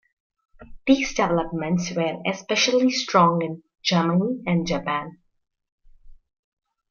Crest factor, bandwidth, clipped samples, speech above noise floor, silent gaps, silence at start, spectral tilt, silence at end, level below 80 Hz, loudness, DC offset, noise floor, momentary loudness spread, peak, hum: 20 dB; 7.2 kHz; under 0.1%; 25 dB; 5.72-5.78 s; 0.6 s; -5 dB/octave; 0.8 s; -50 dBFS; -22 LUFS; under 0.1%; -47 dBFS; 10 LU; -4 dBFS; none